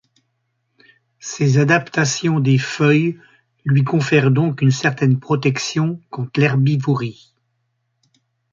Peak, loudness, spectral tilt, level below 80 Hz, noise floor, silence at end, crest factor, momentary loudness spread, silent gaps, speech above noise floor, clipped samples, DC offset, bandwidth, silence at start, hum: -2 dBFS; -17 LUFS; -6 dB/octave; -58 dBFS; -70 dBFS; 1.4 s; 16 dB; 9 LU; none; 54 dB; under 0.1%; under 0.1%; 7.6 kHz; 1.25 s; none